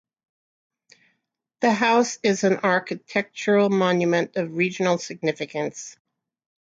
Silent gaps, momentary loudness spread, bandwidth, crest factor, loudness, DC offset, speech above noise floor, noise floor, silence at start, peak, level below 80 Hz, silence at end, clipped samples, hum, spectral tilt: none; 9 LU; 9 kHz; 18 dB; -22 LUFS; under 0.1%; 54 dB; -76 dBFS; 1.6 s; -6 dBFS; -72 dBFS; 0.7 s; under 0.1%; none; -5 dB/octave